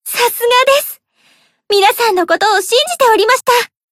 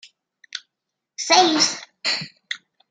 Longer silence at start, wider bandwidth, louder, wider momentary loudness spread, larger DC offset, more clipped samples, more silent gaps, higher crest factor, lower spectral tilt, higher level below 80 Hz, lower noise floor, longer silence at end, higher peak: second, 0.05 s vs 0.55 s; first, 16.5 kHz vs 11 kHz; first, -11 LUFS vs -19 LUFS; second, 5 LU vs 20 LU; neither; neither; neither; second, 12 dB vs 22 dB; about the same, 0 dB/octave vs -1 dB/octave; first, -62 dBFS vs -78 dBFS; second, -54 dBFS vs -82 dBFS; about the same, 0.25 s vs 0.35 s; about the same, 0 dBFS vs 0 dBFS